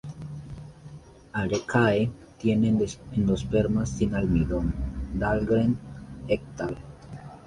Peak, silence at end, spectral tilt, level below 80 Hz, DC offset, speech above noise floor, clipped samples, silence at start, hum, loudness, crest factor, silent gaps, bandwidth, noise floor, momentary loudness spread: -8 dBFS; 0 s; -7 dB/octave; -40 dBFS; under 0.1%; 21 dB; under 0.1%; 0.05 s; none; -26 LUFS; 20 dB; none; 11 kHz; -46 dBFS; 20 LU